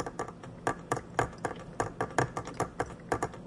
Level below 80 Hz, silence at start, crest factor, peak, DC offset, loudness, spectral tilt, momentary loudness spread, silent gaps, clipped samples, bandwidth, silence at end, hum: -54 dBFS; 0 s; 22 dB; -12 dBFS; under 0.1%; -35 LUFS; -5 dB/octave; 7 LU; none; under 0.1%; 11.5 kHz; 0 s; none